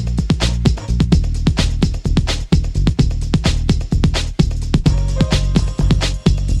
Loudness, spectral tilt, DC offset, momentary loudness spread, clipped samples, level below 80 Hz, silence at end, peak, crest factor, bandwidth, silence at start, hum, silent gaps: -17 LUFS; -6 dB/octave; under 0.1%; 3 LU; under 0.1%; -18 dBFS; 0 s; 0 dBFS; 14 dB; 11.5 kHz; 0 s; none; none